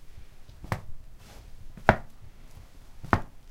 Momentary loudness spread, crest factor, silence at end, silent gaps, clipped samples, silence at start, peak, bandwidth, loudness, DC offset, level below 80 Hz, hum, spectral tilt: 27 LU; 32 dB; 0 s; none; under 0.1%; 0 s; 0 dBFS; 16 kHz; -29 LUFS; under 0.1%; -42 dBFS; none; -6.5 dB/octave